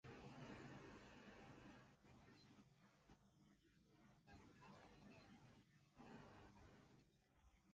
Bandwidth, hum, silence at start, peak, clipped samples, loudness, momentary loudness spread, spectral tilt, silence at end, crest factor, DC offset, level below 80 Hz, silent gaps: 8.8 kHz; none; 0.05 s; -48 dBFS; under 0.1%; -65 LUFS; 9 LU; -5.5 dB/octave; 0 s; 18 dB; under 0.1%; -80 dBFS; none